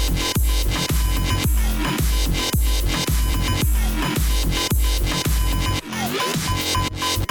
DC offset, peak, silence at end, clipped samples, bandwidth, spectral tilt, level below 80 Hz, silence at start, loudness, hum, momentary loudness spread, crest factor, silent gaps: under 0.1%; -8 dBFS; 0.05 s; under 0.1%; 19.5 kHz; -4 dB/octave; -22 dBFS; 0 s; -21 LUFS; none; 2 LU; 12 dB; none